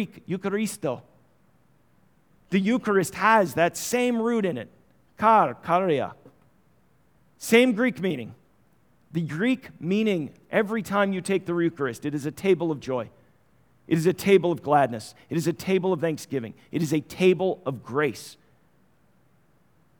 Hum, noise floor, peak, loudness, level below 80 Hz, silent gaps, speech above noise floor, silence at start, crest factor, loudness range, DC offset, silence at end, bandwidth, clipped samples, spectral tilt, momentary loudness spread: none; -64 dBFS; -4 dBFS; -25 LUFS; -68 dBFS; none; 40 dB; 0 s; 22 dB; 4 LU; under 0.1%; 1.65 s; over 20 kHz; under 0.1%; -5.5 dB/octave; 12 LU